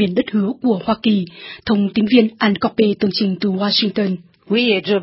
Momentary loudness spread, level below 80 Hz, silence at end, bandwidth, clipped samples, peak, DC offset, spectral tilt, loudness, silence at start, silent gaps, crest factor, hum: 7 LU; -54 dBFS; 0 s; 5.8 kHz; under 0.1%; 0 dBFS; under 0.1%; -10 dB/octave; -17 LUFS; 0 s; none; 16 dB; none